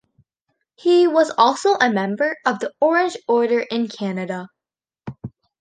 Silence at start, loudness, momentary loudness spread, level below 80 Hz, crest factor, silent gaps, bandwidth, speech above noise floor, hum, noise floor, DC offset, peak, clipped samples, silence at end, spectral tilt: 0.85 s; -19 LUFS; 20 LU; -64 dBFS; 18 dB; none; 9.6 kHz; 71 dB; none; -89 dBFS; under 0.1%; -2 dBFS; under 0.1%; 0.3 s; -5 dB/octave